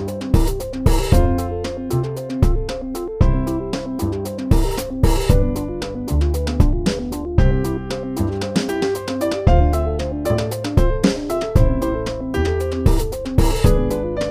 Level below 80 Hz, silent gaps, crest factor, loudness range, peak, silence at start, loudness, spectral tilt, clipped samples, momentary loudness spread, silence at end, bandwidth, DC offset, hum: -20 dBFS; none; 16 dB; 2 LU; 0 dBFS; 0 s; -20 LUFS; -6.5 dB/octave; under 0.1%; 8 LU; 0 s; 16 kHz; under 0.1%; none